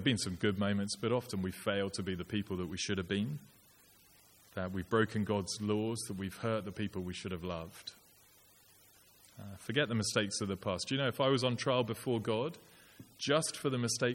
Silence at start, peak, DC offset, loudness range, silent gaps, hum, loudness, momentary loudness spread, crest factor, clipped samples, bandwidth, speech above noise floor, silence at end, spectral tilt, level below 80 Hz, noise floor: 0 s; -16 dBFS; under 0.1%; 7 LU; none; none; -35 LUFS; 10 LU; 20 dB; under 0.1%; 17 kHz; 29 dB; 0 s; -4.5 dB/octave; -66 dBFS; -64 dBFS